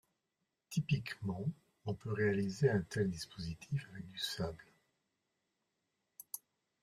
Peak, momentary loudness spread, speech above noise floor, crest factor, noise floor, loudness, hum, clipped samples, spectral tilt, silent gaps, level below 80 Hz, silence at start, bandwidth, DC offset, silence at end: -20 dBFS; 14 LU; 50 dB; 20 dB; -87 dBFS; -39 LUFS; none; under 0.1%; -6 dB/octave; none; -66 dBFS; 0.7 s; 15.5 kHz; under 0.1%; 0.45 s